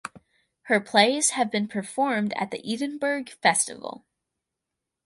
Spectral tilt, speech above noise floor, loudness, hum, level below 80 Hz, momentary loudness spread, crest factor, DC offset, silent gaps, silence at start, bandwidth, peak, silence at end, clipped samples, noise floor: -2.5 dB/octave; 60 dB; -24 LUFS; none; -74 dBFS; 10 LU; 22 dB; under 0.1%; none; 0.05 s; 11.5 kHz; -4 dBFS; 1.1 s; under 0.1%; -85 dBFS